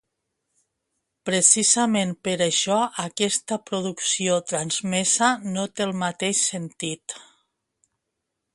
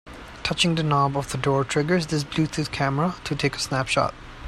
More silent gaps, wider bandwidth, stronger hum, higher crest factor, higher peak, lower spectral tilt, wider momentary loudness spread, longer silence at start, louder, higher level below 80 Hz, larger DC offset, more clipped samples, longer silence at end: neither; second, 11.5 kHz vs 13 kHz; neither; about the same, 22 dB vs 18 dB; first, -2 dBFS vs -6 dBFS; second, -2.5 dB/octave vs -5 dB/octave; first, 13 LU vs 5 LU; first, 1.25 s vs 0.05 s; about the same, -22 LUFS vs -24 LUFS; second, -68 dBFS vs -46 dBFS; neither; neither; first, 1.3 s vs 0 s